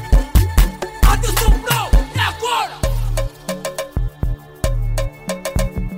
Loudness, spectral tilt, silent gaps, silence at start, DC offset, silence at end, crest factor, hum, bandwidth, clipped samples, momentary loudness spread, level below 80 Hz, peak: -20 LUFS; -4.5 dB/octave; none; 0 s; under 0.1%; 0 s; 16 dB; none; 16.5 kHz; under 0.1%; 9 LU; -18 dBFS; -2 dBFS